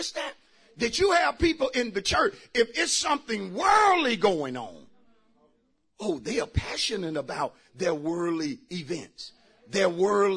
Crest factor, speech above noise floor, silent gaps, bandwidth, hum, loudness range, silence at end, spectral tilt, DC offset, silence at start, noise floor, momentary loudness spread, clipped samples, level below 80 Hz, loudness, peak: 16 dB; 43 dB; none; 11 kHz; none; 7 LU; 0 s; -3.5 dB/octave; under 0.1%; 0 s; -69 dBFS; 13 LU; under 0.1%; -48 dBFS; -26 LUFS; -10 dBFS